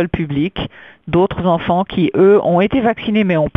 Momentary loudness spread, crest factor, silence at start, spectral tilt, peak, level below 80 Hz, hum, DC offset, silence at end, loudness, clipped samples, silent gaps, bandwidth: 10 LU; 14 dB; 0 s; -9.5 dB/octave; 0 dBFS; -40 dBFS; none; 0.2%; 0.1 s; -15 LUFS; under 0.1%; none; 3.9 kHz